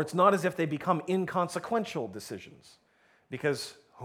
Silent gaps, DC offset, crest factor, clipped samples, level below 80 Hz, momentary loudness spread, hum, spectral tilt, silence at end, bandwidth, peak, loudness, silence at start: none; under 0.1%; 22 dB; under 0.1%; -74 dBFS; 18 LU; none; -5.5 dB/octave; 0 s; 16.5 kHz; -8 dBFS; -30 LUFS; 0 s